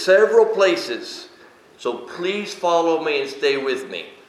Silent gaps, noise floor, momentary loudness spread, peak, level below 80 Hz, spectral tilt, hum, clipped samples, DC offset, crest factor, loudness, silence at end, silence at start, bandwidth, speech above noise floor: none; -48 dBFS; 14 LU; -2 dBFS; -76 dBFS; -3.5 dB/octave; none; under 0.1%; under 0.1%; 18 dB; -20 LUFS; 0.15 s; 0 s; 13 kHz; 29 dB